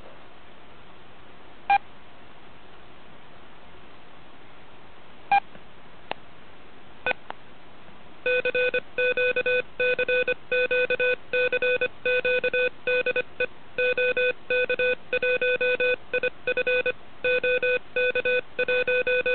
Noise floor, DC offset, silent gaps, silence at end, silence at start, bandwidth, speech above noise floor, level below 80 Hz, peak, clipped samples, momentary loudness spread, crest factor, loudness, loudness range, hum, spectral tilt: -50 dBFS; 1%; none; 0 s; 0.05 s; 4.5 kHz; 25 dB; -60 dBFS; -8 dBFS; under 0.1%; 7 LU; 18 dB; -24 LUFS; 10 LU; none; -7 dB/octave